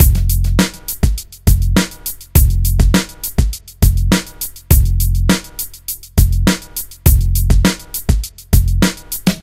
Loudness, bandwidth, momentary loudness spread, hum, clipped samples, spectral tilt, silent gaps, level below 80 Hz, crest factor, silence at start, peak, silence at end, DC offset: -16 LUFS; 16.5 kHz; 9 LU; none; 0.1%; -5 dB/octave; none; -16 dBFS; 14 dB; 0 s; 0 dBFS; 0 s; under 0.1%